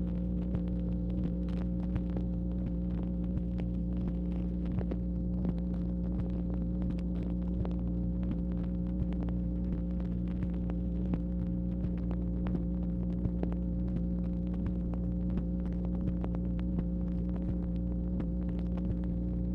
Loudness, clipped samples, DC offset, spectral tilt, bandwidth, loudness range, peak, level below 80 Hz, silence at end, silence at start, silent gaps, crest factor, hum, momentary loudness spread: -34 LUFS; under 0.1%; under 0.1%; -11.5 dB/octave; 4 kHz; 0 LU; -18 dBFS; -36 dBFS; 0 s; 0 s; none; 16 dB; 60 Hz at -35 dBFS; 1 LU